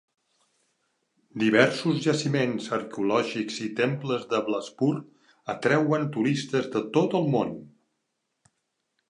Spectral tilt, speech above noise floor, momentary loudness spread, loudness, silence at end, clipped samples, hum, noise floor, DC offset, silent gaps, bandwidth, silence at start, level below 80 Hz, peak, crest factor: -6 dB/octave; 54 dB; 8 LU; -26 LUFS; 1.4 s; under 0.1%; none; -79 dBFS; under 0.1%; none; 11 kHz; 1.35 s; -72 dBFS; -6 dBFS; 22 dB